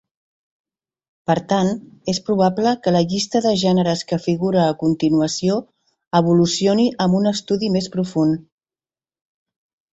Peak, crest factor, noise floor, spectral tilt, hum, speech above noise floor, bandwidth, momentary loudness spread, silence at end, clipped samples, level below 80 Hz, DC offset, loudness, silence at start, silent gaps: -4 dBFS; 16 dB; under -90 dBFS; -6 dB/octave; none; over 72 dB; 8.2 kHz; 6 LU; 1.5 s; under 0.1%; -56 dBFS; under 0.1%; -19 LUFS; 1.3 s; 6.07-6.11 s